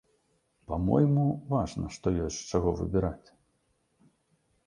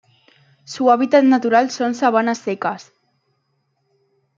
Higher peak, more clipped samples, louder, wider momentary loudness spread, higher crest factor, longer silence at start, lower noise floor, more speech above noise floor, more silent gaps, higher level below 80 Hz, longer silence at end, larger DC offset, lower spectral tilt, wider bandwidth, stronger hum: second, -10 dBFS vs -2 dBFS; neither; second, -29 LUFS vs -17 LUFS; about the same, 10 LU vs 11 LU; about the same, 20 dB vs 18 dB; about the same, 0.7 s vs 0.7 s; first, -73 dBFS vs -68 dBFS; second, 45 dB vs 52 dB; neither; first, -46 dBFS vs -74 dBFS; about the same, 1.5 s vs 1.55 s; neither; first, -7.5 dB/octave vs -4.5 dB/octave; first, 10.5 kHz vs 7.6 kHz; neither